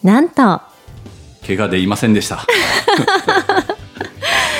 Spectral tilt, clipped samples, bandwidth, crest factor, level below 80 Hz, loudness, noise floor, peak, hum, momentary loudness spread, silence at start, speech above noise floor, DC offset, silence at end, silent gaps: -4.5 dB/octave; under 0.1%; 16.5 kHz; 14 dB; -46 dBFS; -14 LUFS; -36 dBFS; 0 dBFS; none; 11 LU; 0.05 s; 23 dB; under 0.1%; 0 s; none